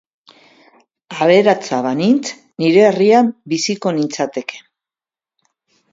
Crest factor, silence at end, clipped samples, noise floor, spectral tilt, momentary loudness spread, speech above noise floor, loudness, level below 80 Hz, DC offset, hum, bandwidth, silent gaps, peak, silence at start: 16 dB; 1.35 s; under 0.1%; under -90 dBFS; -5 dB/octave; 12 LU; over 76 dB; -15 LUFS; -64 dBFS; under 0.1%; none; 7.8 kHz; none; 0 dBFS; 1.1 s